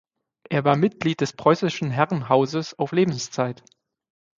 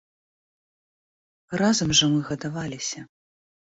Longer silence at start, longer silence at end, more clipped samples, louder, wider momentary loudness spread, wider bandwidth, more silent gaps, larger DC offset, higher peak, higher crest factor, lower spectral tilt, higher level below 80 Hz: second, 0.5 s vs 1.5 s; about the same, 0.85 s vs 0.75 s; neither; about the same, -23 LUFS vs -23 LUFS; second, 7 LU vs 13 LU; about the same, 7.6 kHz vs 8 kHz; neither; neither; first, -2 dBFS vs -8 dBFS; about the same, 22 dB vs 20 dB; first, -6 dB/octave vs -3.5 dB/octave; second, -64 dBFS vs -56 dBFS